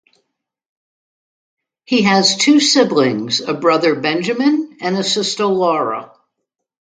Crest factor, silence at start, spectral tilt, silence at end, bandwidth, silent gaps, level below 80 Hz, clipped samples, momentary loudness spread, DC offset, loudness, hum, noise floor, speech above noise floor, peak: 16 dB; 1.9 s; -3.5 dB/octave; 0.95 s; 9.4 kHz; none; -66 dBFS; under 0.1%; 8 LU; under 0.1%; -15 LUFS; none; -77 dBFS; 62 dB; 0 dBFS